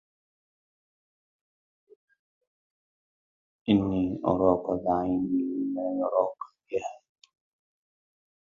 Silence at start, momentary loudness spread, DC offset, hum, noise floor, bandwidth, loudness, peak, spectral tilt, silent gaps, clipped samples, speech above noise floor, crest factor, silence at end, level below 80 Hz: 3.65 s; 10 LU; under 0.1%; none; under -90 dBFS; 7.2 kHz; -28 LUFS; -8 dBFS; -8.5 dB/octave; none; under 0.1%; over 64 dB; 22 dB; 1.5 s; -58 dBFS